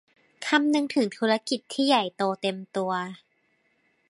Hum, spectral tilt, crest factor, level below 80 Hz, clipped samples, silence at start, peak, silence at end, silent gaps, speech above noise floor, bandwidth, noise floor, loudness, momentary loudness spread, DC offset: none; -4 dB/octave; 20 dB; -78 dBFS; under 0.1%; 0.4 s; -8 dBFS; 0.95 s; none; 44 dB; 11.5 kHz; -69 dBFS; -26 LUFS; 8 LU; under 0.1%